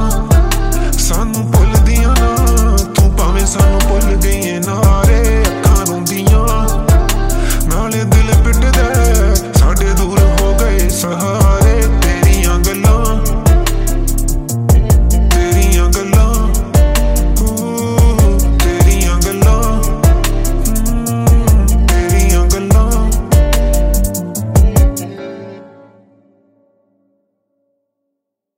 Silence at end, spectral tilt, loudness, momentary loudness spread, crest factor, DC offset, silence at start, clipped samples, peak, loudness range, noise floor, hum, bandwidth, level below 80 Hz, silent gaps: 2.95 s; -5.5 dB/octave; -12 LUFS; 5 LU; 10 dB; under 0.1%; 0 s; under 0.1%; 0 dBFS; 2 LU; -75 dBFS; none; 16.5 kHz; -12 dBFS; none